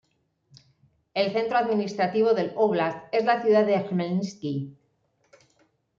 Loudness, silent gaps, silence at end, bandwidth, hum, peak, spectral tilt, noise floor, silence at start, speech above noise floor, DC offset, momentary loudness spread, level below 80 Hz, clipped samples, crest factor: -25 LUFS; none; 1.3 s; 7.4 kHz; none; -10 dBFS; -6.5 dB/octave; -69 dBFS; 1.15 s; 46 dB; under 0.1%; 11 LU; -72 dBFS; under 0.1%; 16 dB